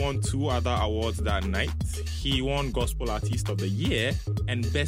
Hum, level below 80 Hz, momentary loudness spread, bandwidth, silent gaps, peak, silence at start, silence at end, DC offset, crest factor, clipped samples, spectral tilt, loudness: none; -34 dBFS; 4 LU; 16 kHz; none; -12 dBFS; 0 s; 0 s; under 0.1%; 16 dB; under 0.1%; -5 dB/octave; -28 LUFS